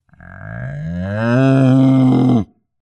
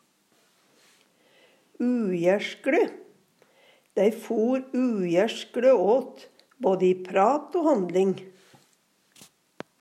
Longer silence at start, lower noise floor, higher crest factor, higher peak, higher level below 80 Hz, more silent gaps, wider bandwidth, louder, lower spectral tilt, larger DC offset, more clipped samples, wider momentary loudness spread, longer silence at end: second, 0.3 s vs 1.8 s; second, -35 dBFS vs -66 dBFS; about the same, 14 dB vs 18 dB; first, -2 dBFS vs -10 dBFS; first, -46 dBFS vs -86 dBFS; neither; second, 8.4 kHz vs 14 kHz; first, -14 LUFS vs -25 LUFS; first, -9 dB/octave vs -6.5 dB/octave; neither; neither; first, 17 LU vs 8 LU; second, 0.35 s vs 1.5 s